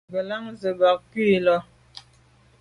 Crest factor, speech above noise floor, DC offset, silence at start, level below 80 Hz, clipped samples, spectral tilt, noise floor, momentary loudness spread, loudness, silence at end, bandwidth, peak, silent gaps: 16 dB; 35 dB; under 0.1%; 0.1 s; -60 dBFS; under 0.1%; -7 dB/octave; -57 dBFS; 10 LU; -23 LUFS; 0.6 s; 10.5 kHz; -8 dBFS; none